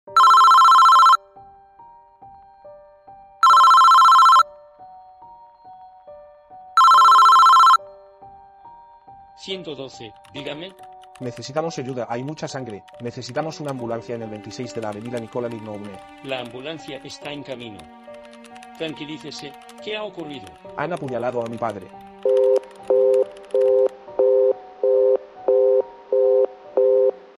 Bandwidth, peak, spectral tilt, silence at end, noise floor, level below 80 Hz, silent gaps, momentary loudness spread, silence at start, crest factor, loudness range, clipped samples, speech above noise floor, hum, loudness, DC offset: 15.5 kHz; -4 dBFS; -3.5 dB/octave; 0.25 s; -48 dBFS; -64 dBFS; none; 24 LU; 0.1 s; 14 dB; 18 LU; under 0.1%; 20 dB; none; -16 LUFS; under 0.1%